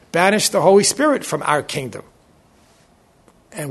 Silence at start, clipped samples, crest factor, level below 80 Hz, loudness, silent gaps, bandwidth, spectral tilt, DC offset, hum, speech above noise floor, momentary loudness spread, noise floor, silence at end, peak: 0.15 s; under 0.1%; 20 dB; -60 dBFS; -16 LUFS; none; 12.5 kHz; -3.5 dB/octave; under 0.1%; none; 38 dB; 19 LU; -54 dBFS; 0 s; 0 dBFS